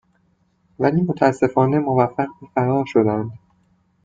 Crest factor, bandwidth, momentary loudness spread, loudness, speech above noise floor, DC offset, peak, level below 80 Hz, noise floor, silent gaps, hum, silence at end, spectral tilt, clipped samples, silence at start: 18 dB; 7.8 kHz; 7 LU; -19 LUFS; 44 dB; under 0.1%; -2 dBFS; -58 dBFS; -63 dBFS; none; none; 0.65 s; -8.5 dB/octave; under 0.1%; 0.8 s